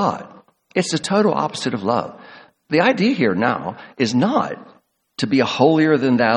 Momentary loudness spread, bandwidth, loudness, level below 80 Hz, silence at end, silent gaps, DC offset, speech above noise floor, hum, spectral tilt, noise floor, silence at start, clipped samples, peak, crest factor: 12 LU; 11 kHz; -19 LUFS; -62 dBFS; 0 s; none; under 0.1%; 27 dB; none; -5.5 dB/octave; -44 dBFS; 0 s; under 0.1%; 0 dBFS; 18 dB